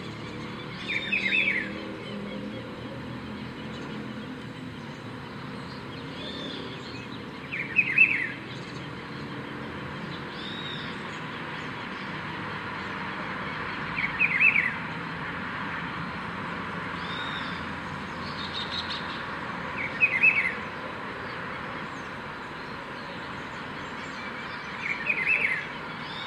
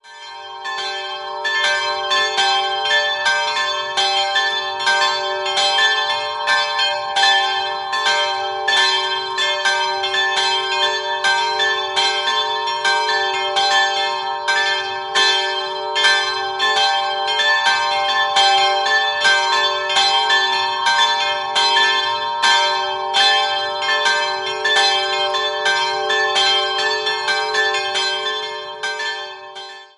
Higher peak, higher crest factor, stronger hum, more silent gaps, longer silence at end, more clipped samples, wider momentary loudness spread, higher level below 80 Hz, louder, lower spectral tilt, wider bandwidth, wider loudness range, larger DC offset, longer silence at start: second, -8 dBFS vs -2 dBFS; about the same, 22 dB vs 18 dB; neither; neither; about the same, 0 s vs 0.1 s; neither; first, 15 LU vs 7 LU; first, -58 dBFS vs -64 dBFS; second, -29 LUFS vs -16 LUFS; first, -5 dB/octave vs 0.5 dB/octave; first, 13.5 kHz vs 11.5 kHz; first, 11 LU vs 2 LU; neither; about the same, 0 s vs 0.05 s